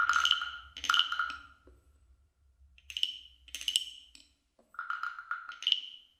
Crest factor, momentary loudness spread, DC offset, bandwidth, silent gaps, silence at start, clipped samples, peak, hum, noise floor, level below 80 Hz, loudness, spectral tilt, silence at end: 28 dB; 18 LU; under 0.1%; 16 kHz; none; 0 s; under 0.1%; -8 dBFS; none; -70 dBFS; -66 dBFS; -32 LUFS; 2.5 dB/octave; 0.2 s